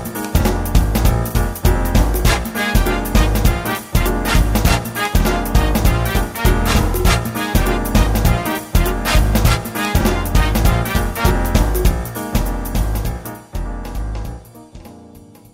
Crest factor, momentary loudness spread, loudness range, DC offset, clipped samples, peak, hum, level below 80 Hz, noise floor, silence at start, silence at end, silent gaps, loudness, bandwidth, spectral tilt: 16 dB; 8 LU; 4 LU; under 0.1%; under 0.1%; 0 dBFS; none; -18 dBFS; -41 dBFS; 0 s; 0.35 s; none; -17 LUFS; 16.5 kHz; -5 dB/octave